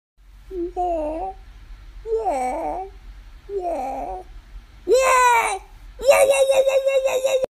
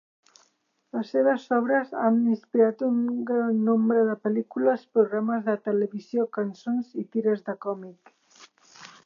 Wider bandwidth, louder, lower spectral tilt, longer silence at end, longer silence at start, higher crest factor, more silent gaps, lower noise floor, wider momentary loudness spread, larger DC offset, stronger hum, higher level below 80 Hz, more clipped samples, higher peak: first, 14.5 kHz vs 7 kHz; first, -20 LUFS vs -25 LUFS; second, -2.5 dB/octave vs -8 dB/octave; about the same, 0.15 s vs 0.15 s; second, 0.35 s vs 0.95 s; about the same, 18 dB vs 18 dB; neither; second, -41 dBFS vs -70 dBFS; first, 18 LU vs 8 LU; neither; neither; first, -42 dBFS vs -84 dBFS; neither; first, -4 dBFS vs -8 dBFS